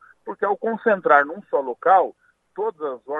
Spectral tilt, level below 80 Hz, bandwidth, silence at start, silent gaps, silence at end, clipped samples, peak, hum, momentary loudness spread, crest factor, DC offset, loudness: -7.5 dB/octave; -78 dBFS; 4 kHz; 0.25 s; none; 0 s; under 0.1%; 0 dBFS; none; 13 LU; 22 dB; under 0.1%; -21 LUFS